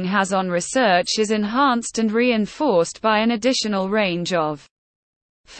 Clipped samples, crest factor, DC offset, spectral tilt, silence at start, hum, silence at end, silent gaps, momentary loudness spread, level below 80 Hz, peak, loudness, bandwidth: under 0.1%; 14 dB; under 0.1%; -4 dB/octave; 0 s; none; 0 s; 4.71-5.44 s; 4 LU; -56 dBFS; -6 dBFS; -20 LUFS; 8.8 kHz